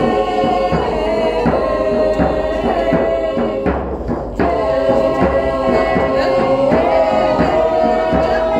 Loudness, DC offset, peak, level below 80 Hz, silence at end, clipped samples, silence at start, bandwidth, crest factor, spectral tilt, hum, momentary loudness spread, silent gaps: -15 LUFS; under 0.1%; -2 dBFS; -30 dBFS; 0 s; under 0.1%; 0 s; 10 kHz; 14 dB; -7 dB/octave; none; 4 LU; none